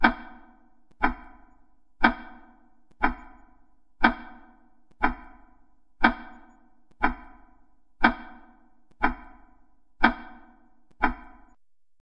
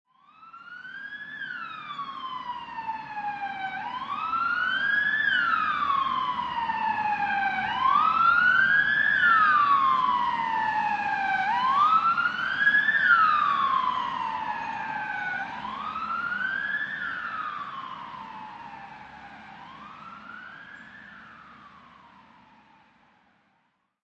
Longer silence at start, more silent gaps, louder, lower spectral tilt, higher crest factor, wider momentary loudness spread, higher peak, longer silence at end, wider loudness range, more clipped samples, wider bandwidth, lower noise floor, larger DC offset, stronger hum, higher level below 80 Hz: second, 0 s vs 0.4 s; neither; about the same, -26 LUFS vs -24 LUFS; first, -6.5 dB/octave vs -3.5 dB/octave; first, 28 dB vs 18 dB; second, 20 LU vs 23 LU; first, -2 dBFS vs -8 dBFS; second, 0.85 s vs 2.25 s; second, 1 LU vs 20 LU; neither; second, 5.6 kHz vs 8.2 kHz; second, -66 dBFS vs -72 dBFS; neither; neither; first, -42 dBFS vs -66 dBFS